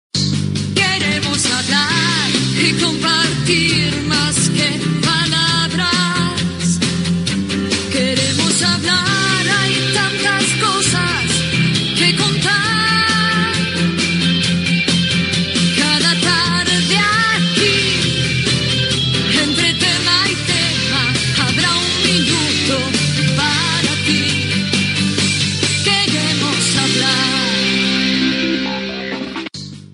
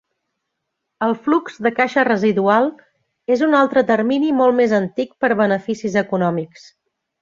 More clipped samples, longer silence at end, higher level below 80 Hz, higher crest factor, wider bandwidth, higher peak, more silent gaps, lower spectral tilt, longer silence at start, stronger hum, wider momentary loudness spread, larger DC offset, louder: neither; second, 0.1 s vs 0.75 s; first, -42 dBFS vs -62 dBFS; about the same, 16 dB vs 16 dB; first, 11 kHz vs 7.6 kHz; about the same, 0 dBFS vs -2 dBFS; neither; second, -3 dB/octave vs -6.5 dB/octave; second, 0.15 s vs 1 s; neither; second, 4 LU vs 8 LU; neither; first, -14 LUFS vs -17 LUFS